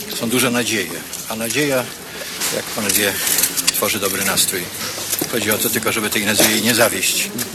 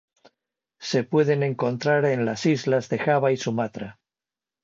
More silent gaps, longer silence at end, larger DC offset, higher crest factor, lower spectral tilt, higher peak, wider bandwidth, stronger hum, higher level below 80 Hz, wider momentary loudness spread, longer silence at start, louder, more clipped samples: neither; second, 0 s vs 0.7 s; neither; about the same, 20 dB vs 18 dB; second, -2 dB/octave vs -6 dB/octave; first, 0 dBFS vs -8 dBFS; first, 19.5 kHz vs 7.8 kHz; neither; first, -52 dBFS vs -66 dBFS; about the same, 10 LU vs 9 LU; second, 0 s vs 0.8 s; first, -17 LUFS vs -23 LUFS; neither